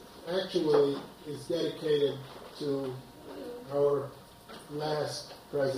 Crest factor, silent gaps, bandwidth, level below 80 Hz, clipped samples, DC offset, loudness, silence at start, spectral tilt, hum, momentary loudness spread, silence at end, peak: 18 dB; none; 16 kHz; -66 dBFS; under 0.1%; under 0.1%; -32 LUFS; 0 s; -5.5 dB/octave; none; 18 LU; 0 s; -14 dBFS